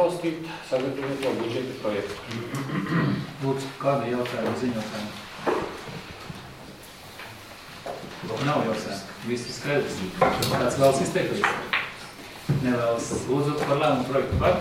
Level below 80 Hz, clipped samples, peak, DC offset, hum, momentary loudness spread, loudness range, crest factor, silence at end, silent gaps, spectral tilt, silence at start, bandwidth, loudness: -50 dBFS; under 0.1%; -6 dBFS; under 0.1%; none; 16 LU; 8 LU; 20 dB; 0 s; none; -5.5 dB/octave; 0 s; 16.5 kHz; -26 LUFS